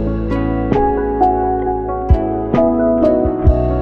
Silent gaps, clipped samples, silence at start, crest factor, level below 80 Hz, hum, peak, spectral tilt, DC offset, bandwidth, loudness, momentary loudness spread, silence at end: none; under 0.1%; 0 s; 14 dB; -22 dBFS; none; 0 dBFS; -10.5 dB/octave; under 0.1%; 5.6 kHz; -15 LUFS; 5 LU; 0 s